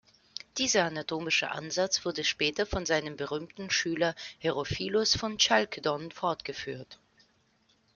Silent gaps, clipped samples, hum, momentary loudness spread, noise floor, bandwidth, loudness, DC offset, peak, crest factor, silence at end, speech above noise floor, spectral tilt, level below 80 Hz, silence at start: none; under 0.1%; none; 12 LU; -69 dBFS; 11 kHz; -29 LUFS; under 0.1%; -8 dBFS; 24 dB; 1 s; 38 dB; -2.5 dB/octave; -56 dBFS; 0.55 s